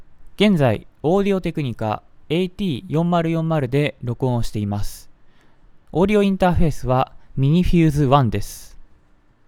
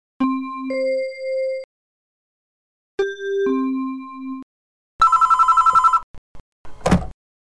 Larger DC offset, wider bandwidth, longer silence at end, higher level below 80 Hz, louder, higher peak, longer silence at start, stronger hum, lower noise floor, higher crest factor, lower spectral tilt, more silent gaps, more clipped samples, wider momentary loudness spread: neither; first, 16.5 kHz vs 11 kHz; first, 0.65 s vs 0.4 s; first, -34 dBFS vs -42 dBFS; about the same, -20 LUFS vs -19 LUFS; first, 0 dBFS vs -6 dBFS; second, 0 s vs 0.2 s; neither; second, -54 dBFS vs under -90 dBFS; about the same, 20 dB vs 16 dB; first, -7.5 dB/octave vs -6 dB/octave; second, none vs 1.64-2.98 s, 4.43-4.99 s, 6.03-6.64 s; neither; second, 10 LU vs 18 LU